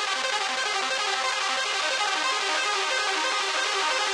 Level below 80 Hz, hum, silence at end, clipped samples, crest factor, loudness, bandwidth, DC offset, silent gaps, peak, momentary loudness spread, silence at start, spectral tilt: -84 dBFS; none; 0 s; under 0.1%; 14 dB; -24 LUFS; 14 kHz; under 0.1%; none; -12 dBFS; 1 LU; 0 s; 2.5 dB/octave